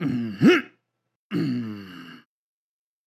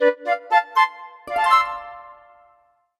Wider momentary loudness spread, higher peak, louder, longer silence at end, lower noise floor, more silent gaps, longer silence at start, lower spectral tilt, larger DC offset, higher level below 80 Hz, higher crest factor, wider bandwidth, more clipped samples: about the same, 23 LU vs 22 LU; about the same, -6 dBFS vs -4 dBFS; second, -23 LUFS vs -20 LUFS; about the same, 0.9 s vs 0.85 s; first, -73 dBFS vs -60 dBFS; first, 1.16-1.30 s vs none; about the same, 0 s vs 0 s; first, -7 dB/octave vs -2 dB/octave; neither; second, -68 dBFS vs -62 dBFS; about the same, 20 dB vs 18 dB; about the same, 13.5 kHz vs 13.5 kHz; neither